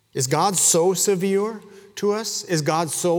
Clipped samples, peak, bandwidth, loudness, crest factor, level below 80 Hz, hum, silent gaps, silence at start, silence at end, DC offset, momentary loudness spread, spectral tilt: under 0.1%; -4 dBFS; over 20 kHz; -20 LUFS; 16 dB; -70 dBFS; none; none; 0.15 s; 0 s; under 0.1%; 11 LU; -3.5 dB/octave